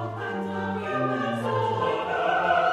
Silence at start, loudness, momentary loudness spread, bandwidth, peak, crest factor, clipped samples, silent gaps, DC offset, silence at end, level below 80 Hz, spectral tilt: 0 s; -26 LUFS; 7 LU; 13 kHz; -10 dBFS; 16 dB; under 0.1%; none; under 0.1%; 0 s; -64 dBFS; -6.5 dB/octave